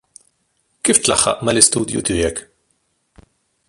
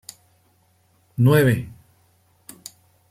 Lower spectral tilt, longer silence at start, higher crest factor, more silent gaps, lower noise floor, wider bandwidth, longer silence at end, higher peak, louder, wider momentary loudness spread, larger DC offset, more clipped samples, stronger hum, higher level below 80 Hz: second, -2.5 dB/octave vs -7 dB/octave; second, 0.85 s vs 1.2 s; about the same, 20 dB vs 20 dB; neither; first, -66 dBFS vs -61 dBFS; about the same, 16 kHz vs 15.5 kHz; about the same, 1.3 s vs 1.4 s; first, 0 dBFS vs -4 dBFS; first, -15 LUFS vs -18 LUFS; second, 9 LU vs 26 LU; neither; neither; neither; first, -42 dBFS vs -56 dBFS